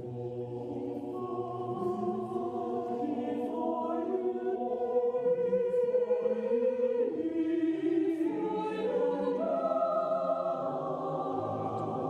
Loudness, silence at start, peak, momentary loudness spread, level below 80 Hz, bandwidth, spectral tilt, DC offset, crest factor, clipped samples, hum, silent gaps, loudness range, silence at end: -32 LUFS; 0 s; -18 dBFS; 7 LU; -74 dBFS; 6.8 kHz; -8.5 dB/octave; under 0.1%; 14 dB; under 0.1%; none; none; 5 LU; 0 s